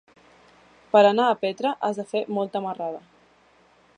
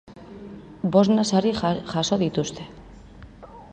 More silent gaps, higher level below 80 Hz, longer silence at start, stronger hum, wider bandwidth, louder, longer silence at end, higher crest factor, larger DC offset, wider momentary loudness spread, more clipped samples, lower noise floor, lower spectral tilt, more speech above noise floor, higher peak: neither; second, -76 dBFS vs -50 dBFS; first, 0.95 s vs 0.1 s; neither; about the same, 9.8 kHz vs 9.4 kHz; about the same, -23 LUFS vs -22 LUFS; first, 1 s vs 0.05 s; about the same, 20 dB vs 20 dB; neither; second, 14 LU vs 23 LU; neither; first, -58 dBFS vs -44 dBFS; about the same, -5.5 dB/octave vs -5.5 dB/octave; first, 36 dB vs 23 dB; about the same, -4 dBFS vs -4 dBFS